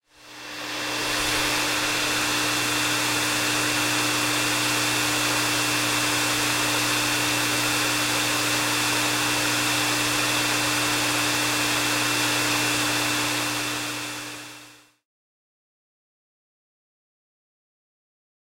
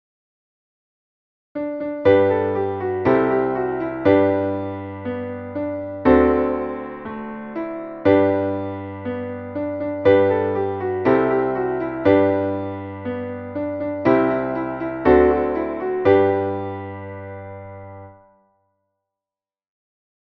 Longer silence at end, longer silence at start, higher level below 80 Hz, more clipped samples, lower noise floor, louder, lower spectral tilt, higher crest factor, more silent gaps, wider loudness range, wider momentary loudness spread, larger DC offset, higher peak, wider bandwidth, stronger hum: first, 3.75 s vs 2.15 s; second, 0.25 s vs 1.55 s; second, -54 dBFS vs -46 dBFS; neither; second, -49 dBFS vs under -90 dBFS; about the same, -22 LUFS vs -20 LUFS; second, -1.5 dB/octave vs -9.5 dB/octave; about the same, 16 dB vs 18 dB; neither; about the same, 5 LU vs 4 LU; second, 5 LU vs 15 LU; neither; second, -10 dBFS vs -2 dBFS; first, 16.5 kHz vs 5 kHz; second, none vs 50 Hz at -55 dBFS